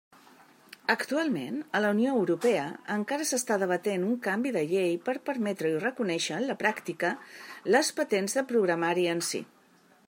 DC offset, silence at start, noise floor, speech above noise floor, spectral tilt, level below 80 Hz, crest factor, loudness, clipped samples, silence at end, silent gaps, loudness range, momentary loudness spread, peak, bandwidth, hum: under 0.1%; 0.9 s; -61 dBFS; 33 dB; -4 dB/octave; -82 dBFS; 20 dB; -29 LUFS; under 0.1%; 0.65 s; none; 1 LU; 6 LU; -10 dBFS; 16 kHz; none